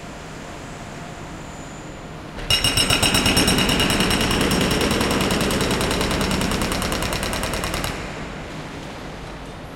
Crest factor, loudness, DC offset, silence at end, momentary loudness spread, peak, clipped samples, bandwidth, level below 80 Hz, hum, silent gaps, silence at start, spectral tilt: 20 dB; -19 LUFS; under 0.1%; 0 s; 18 LU; -2 dBFS; under 0.1%; 17 kHz; -34 dBFS; none; none; 0 s; -3.5 dB/octave